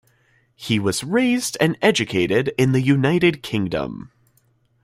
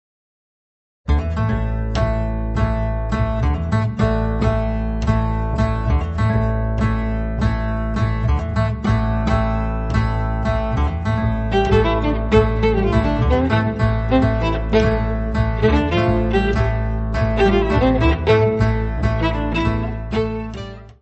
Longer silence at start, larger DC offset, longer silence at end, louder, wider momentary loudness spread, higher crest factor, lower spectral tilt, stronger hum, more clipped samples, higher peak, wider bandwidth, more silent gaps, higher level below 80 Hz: second, 0.6 s vs 1.05 s; neither; first, 0.75 s vs 0.1 s; about the same, -19 LUFS vs -19 LUFS; about the same, 8 LU vs 6 LU; about the same, 18 dB vs 16 dB; second, -5 dB/octave vs -8 dB/octave; neither; neither; about the same, -2 dBFS vs -2 dBFS; first, 16 kHz vs 8.2 kHz; neither; second, -54 dBFS vs -24 dBFS